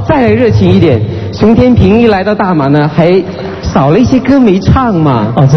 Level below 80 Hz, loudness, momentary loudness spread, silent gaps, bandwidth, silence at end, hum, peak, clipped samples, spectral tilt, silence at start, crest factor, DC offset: -26 dBFS; -8 LUFS; 6 LU; none; 6.4 kHz; 0 s; none; 0 dBFS; 2%; -8 dB/octave; 0 s; 6 dB; 0.5%